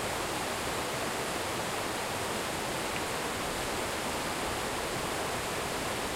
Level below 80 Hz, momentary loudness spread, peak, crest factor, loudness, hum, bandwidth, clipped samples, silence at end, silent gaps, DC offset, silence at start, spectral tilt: -52 dBFS; 0 LU; -18 dBFS; 16 dB; -33 LUFS; none; 16 kHz; under 0.1%; 0 s; none; under 0.1%; 0 s; -2.5 dB/octave